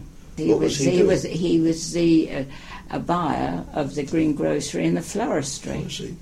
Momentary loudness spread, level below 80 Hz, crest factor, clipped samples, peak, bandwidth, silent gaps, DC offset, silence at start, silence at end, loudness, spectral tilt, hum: 12 LU; -44 dBFS; 16 dB; under 0.1%; -6 dBFS; 13 kHz; none; under 0.1%; 0 s; 0 s; -23 LUFS; -5.5 dB/octave; none